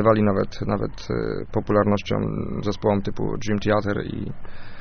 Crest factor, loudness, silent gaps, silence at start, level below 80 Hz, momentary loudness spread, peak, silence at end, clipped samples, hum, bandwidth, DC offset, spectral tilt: 18 dB; -24 LUFS; none; 0 s; -40 dBFS; 9 LU; -4 dBFS; 0 s; under 0.1%; none; 6.6 kHz; under 0.1%; -6.5 dB/octave